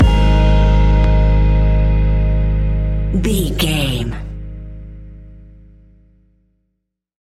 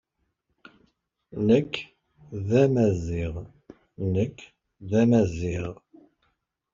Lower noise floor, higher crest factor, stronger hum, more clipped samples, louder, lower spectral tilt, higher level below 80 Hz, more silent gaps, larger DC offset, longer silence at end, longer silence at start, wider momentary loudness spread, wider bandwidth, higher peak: about the same, -73 dBFS vs -76 dBFS; second, 12 dB vs 20 dB; neither; neither; first, -16 LUFS vs -25 LUFS; about the same, -6.5 dB/octave vs -7.5 dB/octave; first, -16 dBFS vs -52 dBFS; neither; neither; first, 1.9 s vs 1 s; second, 0 s vs 1.35 s; about the same, 19 LU vs 19 LU; first, 13.5 kHz vs 7.4 kHz; first, -2 dBFS vs -8 dBFS